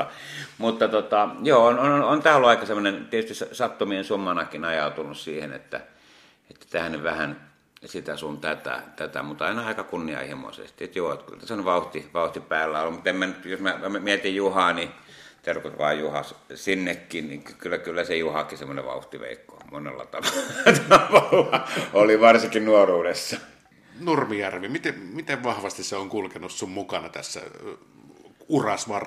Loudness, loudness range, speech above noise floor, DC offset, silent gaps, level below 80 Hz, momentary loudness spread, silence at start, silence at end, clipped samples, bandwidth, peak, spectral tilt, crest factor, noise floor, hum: -23 LUFS; 12 LU; 31 dB; under 0.1%; none; -62 dBFS; 18 LU; 0 s; 0 s; under 0.1%; 15 kHz; -2 dBFS; -4 dB/octave; 22 dB; -55 dBFS; none